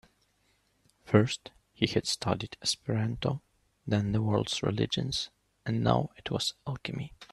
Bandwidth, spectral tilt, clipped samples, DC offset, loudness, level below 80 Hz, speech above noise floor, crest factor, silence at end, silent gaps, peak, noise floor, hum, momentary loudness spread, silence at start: 12.5 kHz; -5 dB/octave; under 0.1%; under 0.1%; -31 LUFS; -56 dBFS; 41 dB; 26 dB; 0.1 s; none; -6 dBFS; -71 dBFS; none; 11 LU; 1.05 s